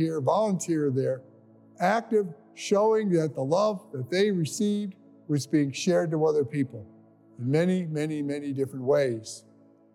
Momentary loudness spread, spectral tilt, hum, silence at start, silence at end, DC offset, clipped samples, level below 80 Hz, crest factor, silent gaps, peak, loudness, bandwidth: 11 LU; -6 dB/octave; none; 0 s; 0.55 s; under 0.1%; under 0.1%; -82 dBFS; 16 dB; none; -10 dBFS; -27 LUFS; 15 kHz